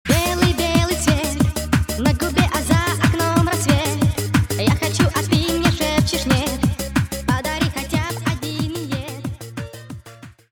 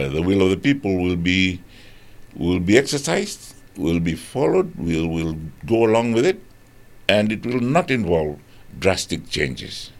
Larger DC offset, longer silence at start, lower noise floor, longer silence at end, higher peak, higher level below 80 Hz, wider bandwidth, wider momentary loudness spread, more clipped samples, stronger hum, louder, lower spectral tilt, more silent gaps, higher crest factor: neither; about the same, 0.05 s vs 0 s; second, -42 dBFS vs -46 dBFS; about the same, 0.2 s vs 0.1 s; about the same, 0 dBFS vs 0 dBFS; first, -32 dBFS vs -44 dBFS; first, 19 kHz vs 16 kHz; about the same, 10 LU vs 11 LU; neither; neither; about the same, -19 LUFS vs -20 LUFS; about the same, -5 dB/octave vs -5.5 dB/octave; neither; about the same, 20 dB vs 20 dB